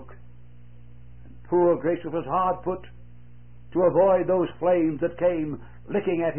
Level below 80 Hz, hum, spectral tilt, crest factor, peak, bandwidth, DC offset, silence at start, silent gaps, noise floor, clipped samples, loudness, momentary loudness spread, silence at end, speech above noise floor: -52 dBFS; 60 Hz at -50 dBFS; -12 dB/octave; 16 dB; -10 dBFS; 3.3 kHz; 0.7%; 0 s; none; -49 dBFS; under 0.1%; -24 LUFS; 11 LU; 0 s; 26 dB